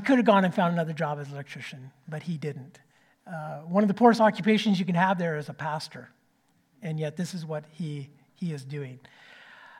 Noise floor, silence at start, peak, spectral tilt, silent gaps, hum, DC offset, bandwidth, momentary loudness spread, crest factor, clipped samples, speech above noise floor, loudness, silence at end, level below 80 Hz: -68 dBFS; 0 s; -6 dBFS; -6.5 dB/octave; none; none; under 0.1%; 13 kHz; 20 LU; 22 dB; under 0.1%; 41 dB; -27 LUFS; 0 s; -80 dBFS